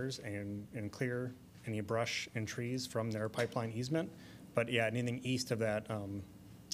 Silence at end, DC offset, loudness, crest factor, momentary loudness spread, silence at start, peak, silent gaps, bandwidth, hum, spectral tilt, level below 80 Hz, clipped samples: 0 s; under 0.1%; -38 LUFS; 22 dB; 11 LU; 0 s; -16 dBFS; none; 15.5 kHz; none; -5 dB/octave; -70 dBFS; under 0.1%